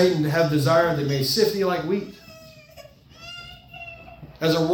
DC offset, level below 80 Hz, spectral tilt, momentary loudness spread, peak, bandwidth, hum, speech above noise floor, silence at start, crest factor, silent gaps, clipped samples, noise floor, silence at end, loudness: under 0.1%; -56 dBFS; -5.5 dB/octave; 22 LU; -6 dBFS; 18 kHz; none; 26 dB; 0 s; 18 dB; none; under 0.1%; -47 dBFS; 0 s; -22 LUFS